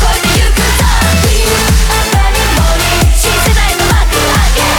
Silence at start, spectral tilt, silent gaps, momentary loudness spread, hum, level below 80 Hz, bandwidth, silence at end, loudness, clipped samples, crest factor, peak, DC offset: 0 s; -3.5 dB/octave; none; 1 LU; none; -12 dBFS; over 20 kHz; 0 s; -9 LUFS; under 0.1%; 8 dB; -2 dBFS; under 0.1%